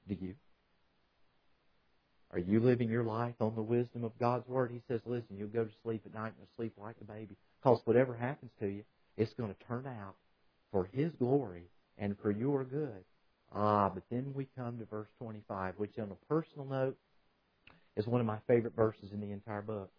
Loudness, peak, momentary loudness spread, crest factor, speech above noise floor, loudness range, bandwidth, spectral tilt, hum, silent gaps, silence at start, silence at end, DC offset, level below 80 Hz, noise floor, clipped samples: -36 LUFS; -12 dBFS; 16 LU; 24 dB; 38 dB; 5 LU; 5.4 kHz; -8 dB/octave; none; none; 0.05 s; 0.1 s; under 0.1%; -72 dBFS; -74 dBFS; under 0.1%